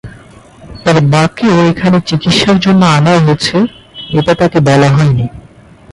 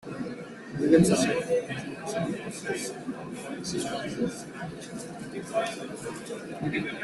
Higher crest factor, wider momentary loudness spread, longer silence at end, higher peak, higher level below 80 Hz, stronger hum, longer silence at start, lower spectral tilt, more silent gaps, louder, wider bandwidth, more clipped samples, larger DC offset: second, 10 dB vs 22 dB; second, 8 LU vs 15 LU; first, 0.55 s vs 0 s; first, 0 dBFS vs -8 dBFS; first, -38 dBFS vs -60 dBFS; neither; about the same, 0.05 s vs 0 s; about the same, -6 dB/octave vs -5 dB/octave; neither; first, -10 LUFS vs -30 LUFS; about the same, 11.5 kHz vs 12.5 kHz; neither; neither